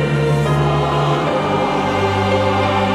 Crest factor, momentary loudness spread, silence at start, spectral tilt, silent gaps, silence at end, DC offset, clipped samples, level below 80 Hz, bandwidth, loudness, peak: 12 dB; 1 LU; 0 s; -6.5 dB/octave; none; 0 s; under 0.1%; under 0.1%; -38 dBFS; 12.5 kHz; -16 LUFS; -4 dBFS